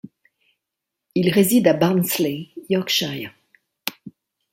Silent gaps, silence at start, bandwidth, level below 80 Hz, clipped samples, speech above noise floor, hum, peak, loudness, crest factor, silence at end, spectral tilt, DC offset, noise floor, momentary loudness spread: none; 1.15 s; 16.5 kHz; -62 dBFS; under 0.1%; 64 dB; none; 0 dBFS; -20 LUFS; 22 dB; 0.45 s; -5 dB/octave; under 0.1%; -83 dBFS; 15 LU